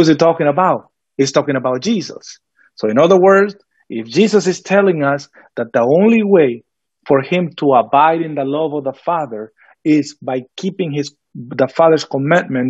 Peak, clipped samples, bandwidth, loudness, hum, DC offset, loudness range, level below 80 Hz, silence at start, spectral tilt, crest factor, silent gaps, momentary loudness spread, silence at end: 0 dBFS; under 0.1%; 8.2 kHz; -15 LUFS; none; under 0.1%; 4 LU; -64 dBFS; 0 s; -6 dB/octave; 14 dB; none; 15 LU; 0 s